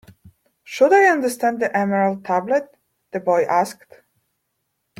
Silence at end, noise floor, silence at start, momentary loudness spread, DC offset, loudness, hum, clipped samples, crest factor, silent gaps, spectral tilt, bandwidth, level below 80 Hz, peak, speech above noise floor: 1.25 s; -74 dBFS; 0.7 s; 12 LU; under 0.1%; -19 LUFS; none; under 0.1%; 18 dB; none; -5.5 dB/octave; 16 kHz; -68 dBFS; -2 dBFS; 56 dB